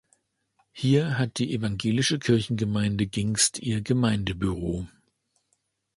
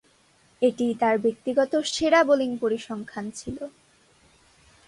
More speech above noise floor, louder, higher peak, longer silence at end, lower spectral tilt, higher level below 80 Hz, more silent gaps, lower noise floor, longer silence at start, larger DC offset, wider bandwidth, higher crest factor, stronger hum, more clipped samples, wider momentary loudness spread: first, 49 dB vs 37 dB; about the same, -25 LUFS vs -24 LUFS; about the same, -8 dBFS vs -6 dBFS; about the same, 1.1 s vs 1.2 s; about the same, -4.5 dB/octave vs -4 dB/octave; first, -48 dBFS vs -60 dBFS; neither; first, -74 dBFS vs -61 dBFS; first, 0.75 s vs 0.6 s; neither; about the same, 11.5 kHz vs 11.5 kHz; about the same, 18 dB vs 18 dB; neither; neither; second, 7 LU vs 15 LU